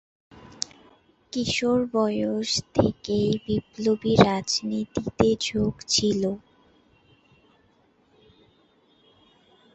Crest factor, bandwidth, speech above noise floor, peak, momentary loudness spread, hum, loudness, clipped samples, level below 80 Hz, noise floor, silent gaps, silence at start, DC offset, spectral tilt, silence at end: 24 dB; 8.4 kHz; 39 dB; -2 dBFS; 12 LU; none; -24 LUFS; under 0.1%; -50 dBFS; -62 dBFS; none; 0.4 s; under 0.1%; -4.5 dB/octave; 3.35 s